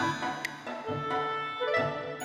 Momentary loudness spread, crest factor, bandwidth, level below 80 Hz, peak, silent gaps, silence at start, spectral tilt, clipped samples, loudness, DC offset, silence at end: 7 LU; 16 dB; 16 kHz; -68 dBFS; -16 dBFS; none; 0 s; -4.5 dB/octave; under 0.1%; -32 LUFS; under 0.1%; 0 s